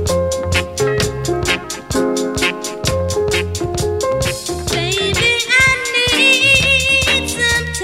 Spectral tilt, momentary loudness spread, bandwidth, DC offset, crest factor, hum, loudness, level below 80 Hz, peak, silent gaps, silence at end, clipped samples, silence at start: -3 dB/octave; 10 LU; 16 kHz; under 0.1%; 16 dB; none; -14 LUFS; -32 dBFS; 0 dBFS; none; 0 s; under 0.1%; 0 s